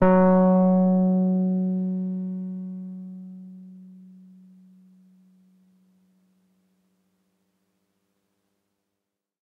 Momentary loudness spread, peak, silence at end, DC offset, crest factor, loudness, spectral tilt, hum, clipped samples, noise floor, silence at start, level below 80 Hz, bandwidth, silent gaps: 25 LU; -6 dBFS; 5.6 s; under 0.1%; 20 dB; -22 LUFS; -12.5 dB/octave; none; under 0.1%; -84 dBFS; 0 s; -56 dBFS; 2.7 kHz; none